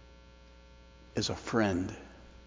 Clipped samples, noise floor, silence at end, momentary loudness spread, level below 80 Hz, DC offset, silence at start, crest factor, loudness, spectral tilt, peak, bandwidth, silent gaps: under 0.1%; -55 dBFS; 0 s; 17 LU; -54 dBFS; under 0.1%; 0.05 s; 22 dB; -33 LUFS; -5 dB/octave; -14 dBFS; 7.6 kHz; none